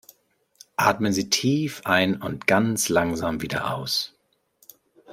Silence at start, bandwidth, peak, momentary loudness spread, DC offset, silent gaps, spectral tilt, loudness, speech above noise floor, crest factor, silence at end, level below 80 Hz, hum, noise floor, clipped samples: 0.8 s; 16.5 kHz; -4 dBFS; 6 LU; under 0.1%; none; -4 dB/octave; -23 LUFS; 41 dB; 22 dB; 0 s; -56 dBFS; none; -64 dBFS; under 0.1%